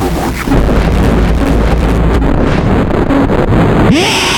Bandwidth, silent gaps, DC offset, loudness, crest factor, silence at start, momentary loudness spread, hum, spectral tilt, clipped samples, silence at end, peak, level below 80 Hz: 18.5 kHz; none; under 0.1%; -10 LUFS; 8 dB; 0 s; 3 LU; none; -6 dB/octave; under 0.1%; 0 s; 0 dBFS; -14 dBFS